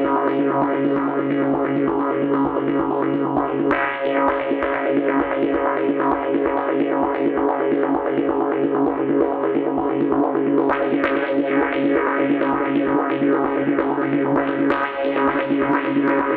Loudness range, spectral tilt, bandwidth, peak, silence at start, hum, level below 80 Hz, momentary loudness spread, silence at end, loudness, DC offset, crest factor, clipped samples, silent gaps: 1 LU; -9.5 dB/octave; 4.4 kHz; -4 dBFS; 0 s; none; -52 dBFS; 2 LU; 0 s; -20 LUFS; under 0.1%; 16 dB; under 0.1%; none